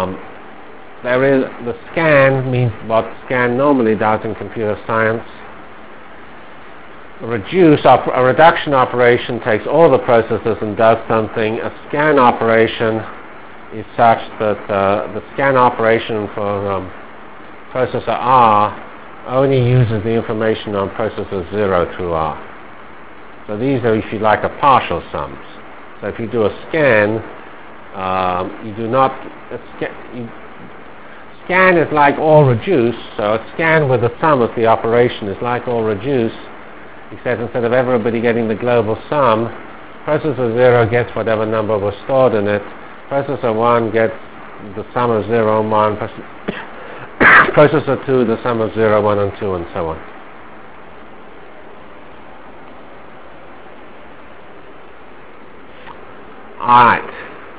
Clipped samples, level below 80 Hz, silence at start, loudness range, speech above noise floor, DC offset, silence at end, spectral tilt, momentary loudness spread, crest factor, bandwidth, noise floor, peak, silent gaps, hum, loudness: 0.1%; -44 dBFS; 0 s; 7 LU; 25 dB; 2%; 0 s; -10.5 dB/octave; 22 LU; 16 dB; 4 kHz; -39 dBFS; 0 dBFS; none; none; -15 LUFS